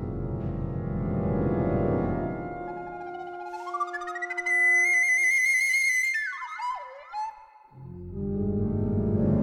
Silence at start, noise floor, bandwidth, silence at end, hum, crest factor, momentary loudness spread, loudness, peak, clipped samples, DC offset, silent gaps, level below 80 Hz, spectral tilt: 0 s; -50 dBFS; 18.5 kHz; 0 s; none; 16 dB; 17 LU; -25 LUFS; -12 dBFS; under 0.1%; under 0.1%; none; -44 dBFS; -5.5 dB/octave